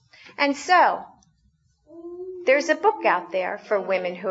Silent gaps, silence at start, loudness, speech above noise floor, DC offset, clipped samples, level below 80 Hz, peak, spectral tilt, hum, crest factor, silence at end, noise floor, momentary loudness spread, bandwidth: none; 0.25 s; -22 LUFS; 43 dB; under 0.1%; under 0.1%; -72 dBFS; -6 dBFS; -3.5 dB/octave; none; 18 dB; 0 s; -64 dBFS; 19 LU; 8 kHz